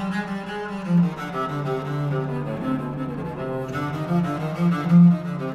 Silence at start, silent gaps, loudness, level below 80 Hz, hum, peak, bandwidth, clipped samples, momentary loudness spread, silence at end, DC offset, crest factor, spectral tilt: 0 s; none; -23 LUFS; -52 dBFS; none; -6 dBFS; 6.6 kHz; under 0.1%; 13 LU; 0 s; under 0.1%; 16 dB; -8.5 dB/octave